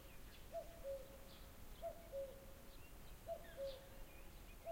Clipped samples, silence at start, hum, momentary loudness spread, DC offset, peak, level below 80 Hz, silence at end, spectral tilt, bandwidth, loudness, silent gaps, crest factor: under 0.1%; 0 s; none; 9 LU; under 0.1%; -38 dBFS; -60 dBFS; 0 s; -4.5 dB/octave; 16.5 kHz; -55 LUFS; none; 16 dB